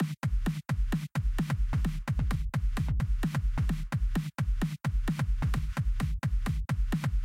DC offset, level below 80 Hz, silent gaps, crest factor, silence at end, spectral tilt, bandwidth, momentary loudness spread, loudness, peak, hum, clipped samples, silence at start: under 0.1%; -32 dBFS; none; 8 dB; 0 s; -7 dB/octave; 15.5 kHz; 2 LU; -32 LUFS; -22 dBFS; none; under 0.1%; 0 s